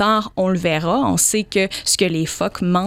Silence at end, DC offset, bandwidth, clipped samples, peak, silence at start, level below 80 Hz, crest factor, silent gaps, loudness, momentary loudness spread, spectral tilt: 0 s; under 0.1%; 16.5 kHz; under 0.1%; -2 dBFS; 0 s; -46 dBFS; 18 dB; none; -18 LUFS; 5 LU; -3.5 dB/octave